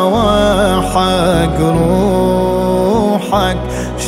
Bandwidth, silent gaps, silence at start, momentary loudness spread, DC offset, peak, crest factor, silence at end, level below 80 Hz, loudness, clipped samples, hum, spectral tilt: 16 kHz; none; 0 s; 3 LU; under 0.1%; 0 dBFS; 12 dB; 0 s; -26 dBFS; -13 LUFS; under 0.1%; none; -6 dB/octave